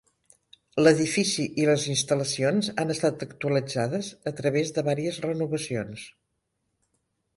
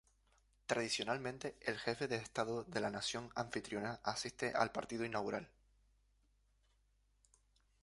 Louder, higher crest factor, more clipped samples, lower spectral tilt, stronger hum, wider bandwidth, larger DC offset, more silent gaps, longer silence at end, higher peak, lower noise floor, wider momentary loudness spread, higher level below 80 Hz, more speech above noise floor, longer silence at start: first, -26 LUFS vs -41 LUFS; about the same, 22 dB vs 26 dB; neither; about the same, -4.5 dB/octave vs -3.5 dB/octave; second, none vs 50 Hz at -70 dBFS; about the same, 11.5 kHz vs 11.5 kHz; neither; neither; second, 1.25 s vs 2.35 s; first, -6 dBFS vs -18 dBFS; about the same, -78 dBFS vs -76 dBFS; first, 10 LU vs 6 LU; first, -64 dBFS vs -72 dBFS; first, 52 dB vs 35 dB; about the same, 0.75 s vs 0.7 s